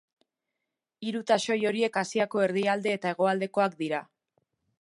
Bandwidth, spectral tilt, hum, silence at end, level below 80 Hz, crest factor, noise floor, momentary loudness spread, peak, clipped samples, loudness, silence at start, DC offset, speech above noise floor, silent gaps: 11.5 kHz; -4.5 dB/octave; none; 0.75 s; -82 dBFS; 20 dB; -86 dBFS; 8 LU; -10 dBFS; under 0.1%; -28 LUFS; 1 s; under 0.1%; 59 dB; none